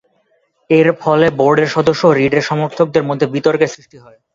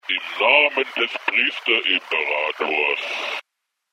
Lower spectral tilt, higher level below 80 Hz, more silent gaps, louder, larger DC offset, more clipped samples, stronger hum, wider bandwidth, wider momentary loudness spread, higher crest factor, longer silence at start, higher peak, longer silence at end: first, -6.5 dB/octave vs -1.5 dB/octave; first, -52 dBFS vs -76 dBFS; neither; first, -14 LUFS vs -19 LUFS; neither; neither; neither; second, 7.6 kHz vs 15.5 kHz; second, 5 LU vs 10 LU; second, 14 dB vs 22 dB; first, 0.7 s vs 0.05 s; about the same, 0 dBFS vs 0 dBFS; second, 0.35 s vs 0.55 s